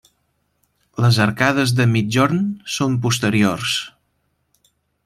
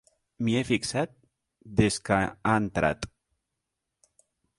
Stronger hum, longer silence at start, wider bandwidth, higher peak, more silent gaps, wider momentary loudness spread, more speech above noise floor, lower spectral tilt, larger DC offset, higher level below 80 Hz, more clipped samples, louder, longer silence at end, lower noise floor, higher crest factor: neither; first, 1 s vs 0.4 s; first, 15 kHz vs 11.5 kHz; first, -2 dBFS vs -6 dBFS; neither; about the same, 7 LU vs 8 LU; second, 51 dB vs 58 dB; about the same, -5 dB/octave vs -5 dB/octave; neither; about the same, -54 dBFS vs -50 dBFS; neither; first, -18 LUFS vs -27 LUFS; second, 1.15 s vs 1.55 s; second, -68 dBFS vs -84 dBFS; about the same, 18 dB vs 22 dB